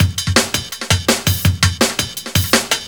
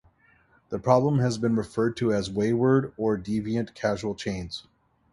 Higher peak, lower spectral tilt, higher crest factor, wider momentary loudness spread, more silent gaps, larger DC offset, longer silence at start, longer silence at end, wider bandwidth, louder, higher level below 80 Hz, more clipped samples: first, 0 dBFS vs -6 dBFS; second, -3 dB/octave vs -7 dB/octave; about the same, 16 dB vs 20 dB; second, 5 LU vs 10 LU; neither; first, 0.3% vs under 0.1%; second, 0 s vs 0.7 s; second, 0 s vs 0.55 s; first, over 20 kHz vs 11.5 kHz; first, -16 LUFS vs -26 LUFS; first, -34 dBFS vs -54 dBFS; neither